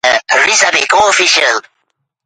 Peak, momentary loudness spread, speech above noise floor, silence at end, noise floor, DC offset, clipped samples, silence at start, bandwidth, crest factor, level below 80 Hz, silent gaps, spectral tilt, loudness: 0 dBFS; 4 LU; 56 dB; 0.65 s; -67 dBFS; under 0.1%; under 0.1%; 0.05 s; 11.5 kHz; 12 dB; -54 dBFS; none; 1 dB/octave; -9 LUFS